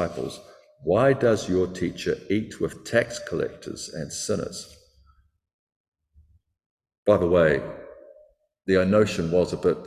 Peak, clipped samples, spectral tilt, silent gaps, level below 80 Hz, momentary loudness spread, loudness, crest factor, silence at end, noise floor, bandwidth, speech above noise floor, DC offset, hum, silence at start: -6 dBFS; under 0.1%; -5.5 dB/octave; 5.53-5.67 s, 5.76-5.92 s, 6.66-6.78 s, 6.98-7.03 s; -48 dBFS; 15 LU; -24 LUFS; 20 dB; 0 s; -62 dBFS; 14 kHz; 38 dB; under 0.1%; none; 0 s